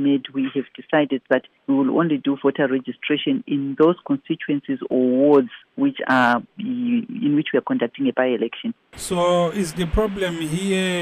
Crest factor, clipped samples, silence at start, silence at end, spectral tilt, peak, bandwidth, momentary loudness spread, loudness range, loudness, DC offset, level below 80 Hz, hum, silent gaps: 16 dB; under 0.1%; 0 s; 0 s; -5.5 dB/octave; -6 dBFS; 14 kHz; 8 LU; 2 LU; -21 LUFS; under 0.1%; -42 dBFS; none; none